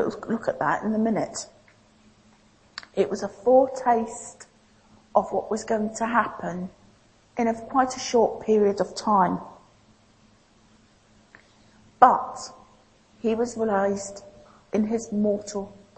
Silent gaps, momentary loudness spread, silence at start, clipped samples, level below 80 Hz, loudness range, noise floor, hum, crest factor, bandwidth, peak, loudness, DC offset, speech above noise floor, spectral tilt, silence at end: none; 17 LU; 0 s; under 0.1%; -60 dBFS; 4 LU; -58 dBFS; none; 26 dB; 8.8 kHz; 0 dBFS; -24 LUFS; under 0.1%; 34 dB; -5 dB/octave; 0.25 s